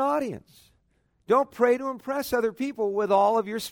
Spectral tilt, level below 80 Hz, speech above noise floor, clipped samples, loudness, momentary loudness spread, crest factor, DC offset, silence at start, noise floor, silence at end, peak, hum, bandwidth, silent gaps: -5 dB/octave; -64 dBFS; 44 dB; under 0.1%; -25 LUFS; 9 LU; 16 dB; under 0.1%; 0 s; -69 dBFS; 0 s; -8 dBFS; none; 19 kHz; none